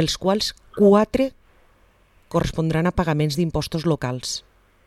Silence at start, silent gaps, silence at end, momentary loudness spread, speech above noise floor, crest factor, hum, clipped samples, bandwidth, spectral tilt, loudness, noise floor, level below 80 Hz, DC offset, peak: 0 s; none; 0.45 s; 10 LU; 36 dB; 18 dB; none; under 0.1%; 14.5 kHz; -5.5 dB/octave; -21 LUFS; -57 dBFS; -40 dBFS; under 0.1%; -4 dBFS